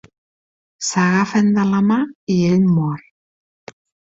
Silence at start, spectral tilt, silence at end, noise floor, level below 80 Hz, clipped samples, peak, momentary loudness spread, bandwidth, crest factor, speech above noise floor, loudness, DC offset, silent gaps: 0.8 s; -6 dB/octave; 1.15 s; under -90 dBFS; -56 dBFS; under 0.1%; -2 dBFS; 8 LU; 7.8 kHz; 16 dB; over 74 dB; -17 LUFS; under 0.1%; 2.15-2.27 s